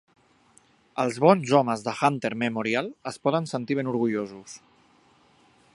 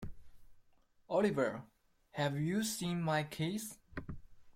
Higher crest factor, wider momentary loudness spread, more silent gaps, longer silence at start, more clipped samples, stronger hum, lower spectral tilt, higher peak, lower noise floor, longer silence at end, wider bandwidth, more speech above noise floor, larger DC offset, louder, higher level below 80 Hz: first, 24 dB vs 18 dB; about the same, 17 LU vs 16 LU; neither; first, 0.95 s vs 0 s; neither; neither; about the same, -6 dB/octave vs -5 dB/octave; first, -2 dBFS vs -20 dBFS; second, -60 dBFS vs -67 dBFS; first, 1.15 s vs 0.05 s; second, 11.5 kHz vs 16.5 kHz; first, 36 dB vs 32 dB; neither; first, -25 LUFS vs -36 LUFS; second, -70 dBFS vs -60 dBFS